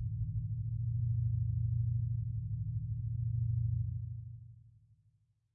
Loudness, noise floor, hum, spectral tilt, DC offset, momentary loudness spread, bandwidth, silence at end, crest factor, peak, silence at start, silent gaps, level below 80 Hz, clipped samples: -37 LUFS; -73 dBFS; none; -13.5 dB/octave; under 0.1%; 10 LU; 0.3 kHz; 0.85 s; 10 dB; -26 dBFS; 0 s; none; -48 dBFS; under 0.1%